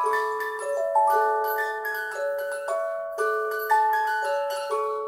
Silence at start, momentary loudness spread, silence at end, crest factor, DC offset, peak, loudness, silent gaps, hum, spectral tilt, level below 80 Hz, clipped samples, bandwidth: 0 s; 7 LU; 0 s; 16 dB; under 0.1%; -10 dBFS; -25 LUFS; none; none; -0.5 dB/octave; -78 dBFS; under 0.1%; 16.5 kHz